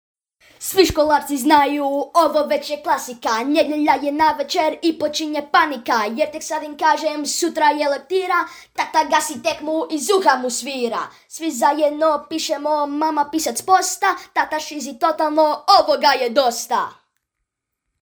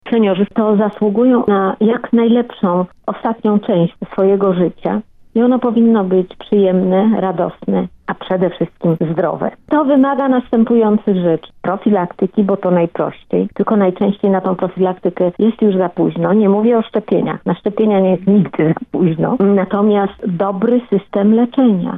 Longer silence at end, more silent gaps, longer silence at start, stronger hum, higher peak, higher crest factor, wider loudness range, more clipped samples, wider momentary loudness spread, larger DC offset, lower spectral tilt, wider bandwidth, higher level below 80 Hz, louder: first, 1.1 s vs 0 s; neither; first, 0.6 s vs 0.05 s; neither; about the same, 0 dBFS vs -2 dBFS; first, 18 dB vs 10 dB; about the same, 2 LU vs 2 LU; neither; about the same, 8 LU vs 6 LU; neither; second, -2 dB/octave vs -11 dB/octave; first, over 20 kHz vs 3.9 kHz; about the same, -52 dBFS vs -52 dBFS; second, -19 LUFS vs -15 LUFS